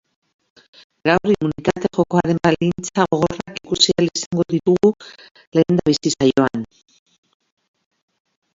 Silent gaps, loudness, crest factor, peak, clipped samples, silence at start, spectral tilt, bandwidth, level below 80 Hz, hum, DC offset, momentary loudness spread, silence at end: 4.26-4.31 s, 5.31-5.35 s, 5.47-5.52 s; -18 LUFS; 20 dB; 0 dBFS; under 0.1%; 1.05 s; -5 dB/octave; 7.8 kHz; -50 dBFS; none; under 0.1%; 7 LU; 1.9 s